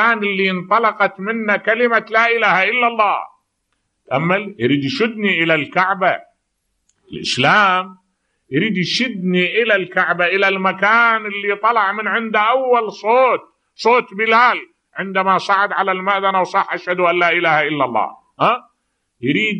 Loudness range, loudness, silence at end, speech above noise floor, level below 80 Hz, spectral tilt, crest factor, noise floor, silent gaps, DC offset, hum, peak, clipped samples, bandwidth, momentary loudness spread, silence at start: 3 LU; -16 LUFS; 0 s; 54 dB; -68 dBFS; -5 dB/octave; 16 dB; -70 dBFS; none; under 0.1%; none; 0 dBFS; under 0.1%; 10 kHz; 8 LU; 0 s